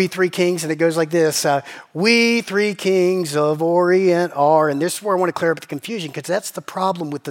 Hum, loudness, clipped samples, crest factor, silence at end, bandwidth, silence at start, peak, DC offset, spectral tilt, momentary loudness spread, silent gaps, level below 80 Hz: none; -18 LUFS; under 0.1%; 16 dB; 0 s; 17 kHz; 0 s; -2 dBFS; under 0.1%; -4.5 dB/octave; 11 LU; none; -76 dBFS